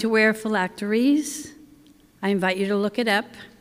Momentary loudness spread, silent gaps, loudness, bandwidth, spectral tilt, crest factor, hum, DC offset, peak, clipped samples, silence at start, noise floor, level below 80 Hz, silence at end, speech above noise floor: 12 LU; none; -23 LUFS; 16 kHz; -4.5 dB/octave; 18 dB; none; under 0.1%; -6 dBFS; under 0.1%; 0 s; -53 dBFS; -64 dBFS; 0.15 s; 31 dB